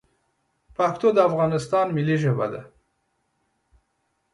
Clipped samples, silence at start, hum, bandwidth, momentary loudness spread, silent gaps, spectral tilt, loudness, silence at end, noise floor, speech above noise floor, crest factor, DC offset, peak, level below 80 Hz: under 0.1%; 0.8 s; none; 11.5 kHz; 10 LU; none; -7.5 dB/octave; -22 LUFS; 1.65 s; -73 dBFS; 51 dB; 20 dB; under 0.1%; -4 dBFS; -62 dBFS